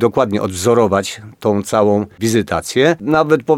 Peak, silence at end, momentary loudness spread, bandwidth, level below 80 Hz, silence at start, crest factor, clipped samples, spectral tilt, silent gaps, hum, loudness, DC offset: 0 dBFS; 0 s; 5 LU; 16.5 kHz; -48 dBFS; 0 s; 14 dB; under 0.1%; -5.5 dB/octave; none; none; -15 LUFS; under 0.1%